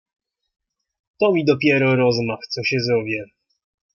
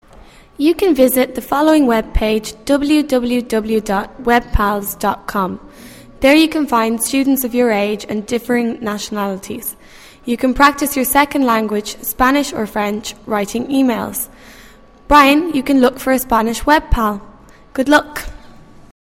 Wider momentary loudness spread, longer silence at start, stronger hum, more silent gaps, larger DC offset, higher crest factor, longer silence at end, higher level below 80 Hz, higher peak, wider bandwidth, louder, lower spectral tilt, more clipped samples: about the same, 9 LU vs 11 LU; first, 1.2 s vs 0.6 s; neither; neither; neither; about the same, 18 dB vs 16 dB; first, 0.7 s vs 0.5 s; second, -62 dBFS vs -32 dBFS; second, -4 dBFS vs 0 dBFS; second, 7 kHz vs 16.5 kHz; second, -19 LUFS vs -15 LUFS; first, -6.5 dB/octave vs -4 dB/octave; neither